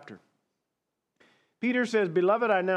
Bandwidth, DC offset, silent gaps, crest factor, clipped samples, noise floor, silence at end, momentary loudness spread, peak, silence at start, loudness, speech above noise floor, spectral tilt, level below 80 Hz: 9.8 kHz; under 0.1%; none; 18 dB; under 0.1%; -84 dBFS; 0 s; 5 LU; -12 dBFS; 0.05 s; -26 LUFS; 59 dB; -6 dB/octave; under -90 dBFS